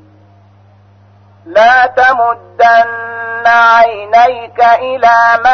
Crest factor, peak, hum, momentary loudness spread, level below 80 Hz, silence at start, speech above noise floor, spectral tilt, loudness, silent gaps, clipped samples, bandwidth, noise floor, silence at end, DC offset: 10 dB; 0 dBFS; none; 8 LU; -50 dBFS; 1.45 s; 35 dB; -3 dB/octave; -9 LUFS; none; under 0.1%; 6.4 kHz; -43 dBFS; 0 s; under 0.1%